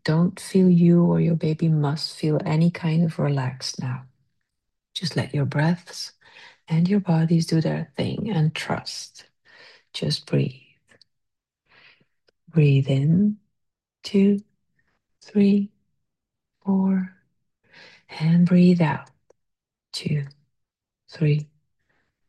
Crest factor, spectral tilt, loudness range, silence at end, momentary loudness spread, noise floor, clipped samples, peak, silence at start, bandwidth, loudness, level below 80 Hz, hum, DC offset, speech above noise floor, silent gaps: 16 dB; -7 dB/octave; 6 LU; 0.85 s; 16 LU; -83 dBFS; under 0.1%; -8 dBFS; 0.05 s; 11.5 kHz; -22 LUFS; -66 dBFS; none; under 0.1%; 62 dB; none